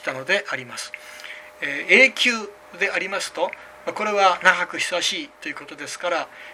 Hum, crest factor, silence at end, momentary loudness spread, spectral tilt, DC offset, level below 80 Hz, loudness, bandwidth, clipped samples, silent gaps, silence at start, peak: none; 22 dB; 0 s; 18 LU; -1.5 dB/octave; under 0.1%; -68 dBFS; -20 LUFS; 16 kHz; under 0.1%; none; 0 s; 0 dBFS